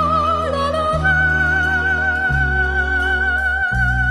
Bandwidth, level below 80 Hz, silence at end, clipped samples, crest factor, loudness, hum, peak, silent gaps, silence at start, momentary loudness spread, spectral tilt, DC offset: 12 kHz; -26 dBFS; 0 s; under 0.1%; 12 dB; -17 LUFS; none; -4 dBFS; none; 0 s; 3 LU; -6 dB/octave; under 0.1%